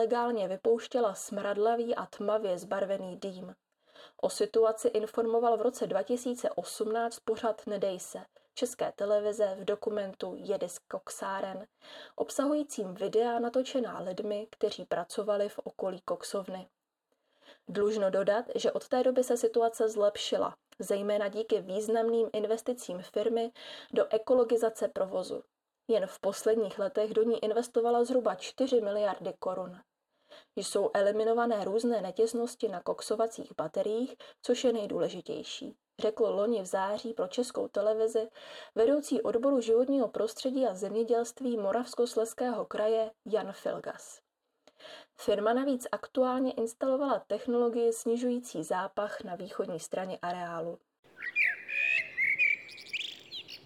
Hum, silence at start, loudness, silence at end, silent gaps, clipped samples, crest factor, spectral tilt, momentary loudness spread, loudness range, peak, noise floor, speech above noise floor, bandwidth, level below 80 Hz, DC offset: none; 0 s; -31 LUFS; 0.1 s; 50.99-51.03 s; under 0.1%; 16 dB; -4 dB/octave; 11 LU; 4 LU; -16 dBFS; -81 dBFS; 49 dB; 14.5 kHz; -78 dBFS; under 0.1%